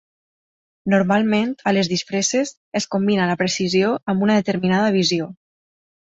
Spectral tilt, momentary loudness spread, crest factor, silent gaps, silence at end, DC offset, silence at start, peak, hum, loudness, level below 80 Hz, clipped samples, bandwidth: -4.5 dB/octave; 7 LU; 16 dB; 2.57-2.72 s; 0.7 s; under 0.1%; 0.85 s; -4 dBFS; none; -19 LUFS; -60 dBFS; under 0.1%; 8 kHz